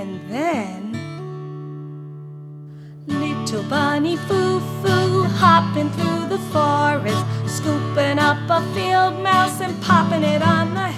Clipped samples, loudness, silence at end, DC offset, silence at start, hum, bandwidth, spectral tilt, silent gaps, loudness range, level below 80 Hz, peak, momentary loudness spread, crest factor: under 0.1%; -19 LUFS; 0 s; under 0.1%; 0 s; none; 15 kHz; -5.5 dB/octave; none; 9 LU; -60 dBFS; 0 dBFS; 17 LU; 18 dB